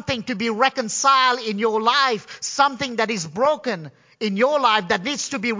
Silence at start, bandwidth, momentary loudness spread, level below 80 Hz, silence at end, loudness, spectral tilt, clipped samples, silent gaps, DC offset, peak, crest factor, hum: 0.05 s; 7.8 kHz; 9 LU; -58 dBFS; 0 s; -20 LUFS; -3 dB/octave; under 0.1%; none; under 0.1%; -2 dBFS; 18 dB; none